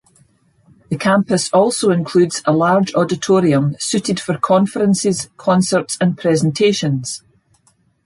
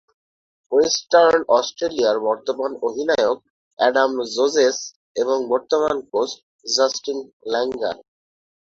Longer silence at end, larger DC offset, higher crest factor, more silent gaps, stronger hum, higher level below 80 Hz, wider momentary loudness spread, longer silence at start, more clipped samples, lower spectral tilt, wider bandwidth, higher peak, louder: first, 0.9 s vs 0.7 s; neither; about the same, 14 dB vs 18 dB; second, none vs 3.50-3.77 s, 4.96-5.15 s, 6.43-6.59 s, 7.33-7.40 s; neither; first, -56 dBFS vs -62 dBFS; second, 6 LU vs 11 LU; first, 0.9 s vs 0.7 s; neither; first, -5.5 dB/octave vs -2 dB/octave; first, 11.5 kHz vs 7.8 kHz; about the same, -2 dBFS vs -2 dBFS; first, -16 LUFS vs -20 LUFS